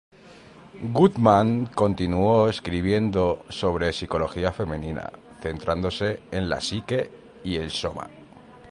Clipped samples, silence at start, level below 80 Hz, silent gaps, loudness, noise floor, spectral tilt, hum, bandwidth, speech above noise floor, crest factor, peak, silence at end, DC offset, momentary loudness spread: under 0.1%; 0.25 s; -42 dBFS; none; -24 LUFS; -48 dBFS; -6.5 dB/octave; none; 11 kHz; 25 dB; 22 dB; -2 dBFS; 0 s; under 0.1%; 15 LU